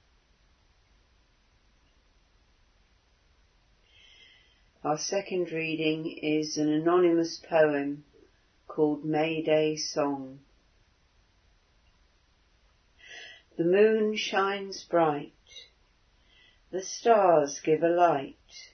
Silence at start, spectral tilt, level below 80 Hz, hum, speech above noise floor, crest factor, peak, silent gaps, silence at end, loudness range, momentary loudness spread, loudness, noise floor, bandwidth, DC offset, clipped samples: 4.85 s; -4.5 dB/octave; -68 dBFS; none; 39 dB; 22 dB; -8 dBFS; none; 0.05 s; 9 LU; 21 LU; -27 LUFS; -66 dBFS; 6.6 kHz; under 0.1%; under 0.1%